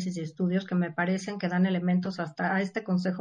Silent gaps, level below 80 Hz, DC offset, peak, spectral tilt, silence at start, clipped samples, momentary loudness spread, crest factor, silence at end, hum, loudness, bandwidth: none; -74 dBFS; under 0.1%; -16 dBFS; -7 dB/octave; 0 s; under 0.1%; 5 LU; 12 dB; 0 s; none; -29 LUFS; 9.6 kHz